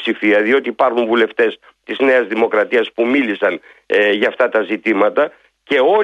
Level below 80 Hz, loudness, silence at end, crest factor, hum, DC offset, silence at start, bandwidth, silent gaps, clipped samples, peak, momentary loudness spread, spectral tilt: -66 dBFS; -15 LUFS; 0 s; 14 dB; none; under 0.1%; 0 s; 8.4 kHz; none; under 0.1%; -2 dBFS; 5 LU; -5.5 dB/octave